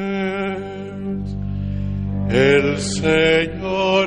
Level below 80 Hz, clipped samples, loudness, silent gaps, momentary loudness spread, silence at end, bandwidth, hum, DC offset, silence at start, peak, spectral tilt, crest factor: -36 dBFS; under 0.1%; -19 LUFS; none; 12 LU; 0 s; 10.5 kHz; 50 Hz at -45 dBFS; under 0.1%; 0 s; -4 dBFS; -5.5 dB/octave; 16 dB